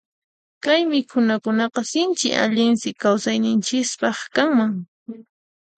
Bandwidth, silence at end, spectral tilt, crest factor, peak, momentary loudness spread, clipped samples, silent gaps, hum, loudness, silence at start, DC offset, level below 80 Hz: 9.2 kHz; 0.55 s; -3.5 dB/octave; 18 dB; -4 dBFS; 8 LU; under 0.1%; 4.88-5.06 s; none; -20 LUFS; 0.65 s; under 0.1%; -70 dBFS